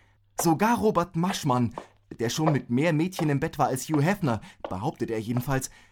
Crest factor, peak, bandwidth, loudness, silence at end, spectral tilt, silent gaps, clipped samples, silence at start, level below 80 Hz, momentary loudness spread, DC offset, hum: 16 dB; -10 dBFS; 18 kHz; -26 LUFS; 0.2 s; -5.5 dB/octave; none; under 0.1%; 0.4 s; -52 dBFS; 9 LU; under 0.1%; none